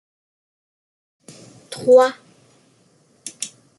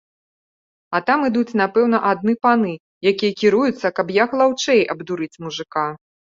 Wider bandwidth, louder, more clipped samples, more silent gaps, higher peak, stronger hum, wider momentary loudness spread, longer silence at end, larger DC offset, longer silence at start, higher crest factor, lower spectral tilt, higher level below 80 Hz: first, 12 kHz vs 7.6 kHz; about the same, -17 LUFS vs -19 LUFS; neither; second, none vs 2.80-3.01 s; about the same, -2 dBFS vs -2 dBFS; neither; first, 23 LU vs 9 LU; second, 0.3 s vs 0.45 s; neither; first, 1.7 s vs 0.9 s; about the same, 20 dB vs 18 dB; second, -3 dB/octave vs -5 dB/octave; second, -72 dBFS vs -64 dBFS